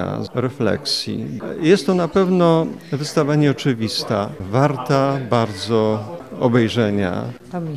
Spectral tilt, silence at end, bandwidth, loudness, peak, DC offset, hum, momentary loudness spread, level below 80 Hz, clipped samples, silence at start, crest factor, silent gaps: -6 dB/octave; 0 s; 14.5 kHz; -19 LUFS; -2 dBFS; 0.2%; none; 10 LU; -54 dBFS; under 0.1%; 0 s; 16 dB; none